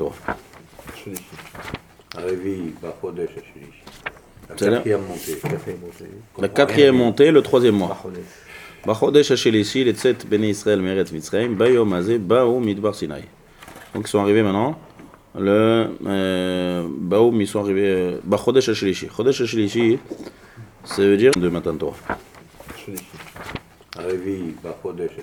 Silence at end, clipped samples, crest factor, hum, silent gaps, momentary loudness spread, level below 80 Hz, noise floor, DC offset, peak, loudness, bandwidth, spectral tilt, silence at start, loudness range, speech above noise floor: 0 s; under 0.1%; 20 dB; none; none; 21 LU; -52 dBFS; -45 dBFS; under 0.1%; 0 dBFS; -19 LUFS; 19.5 kHz; -5.5 dB/octave; 0 s; 12 LU; 25 dB